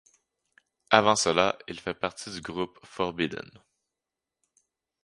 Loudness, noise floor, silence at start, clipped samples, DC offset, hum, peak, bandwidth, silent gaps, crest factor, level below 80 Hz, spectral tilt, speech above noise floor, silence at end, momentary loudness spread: -27 LUFS; -88 dBFS; 0.9 s; under 0.1%; under 0.1%; none; 0 dBFS; 11.5 kHz; none; 30 dB; -62 dBFS; -3 dB/octave; 61 dB; 1.65 s; 15 LU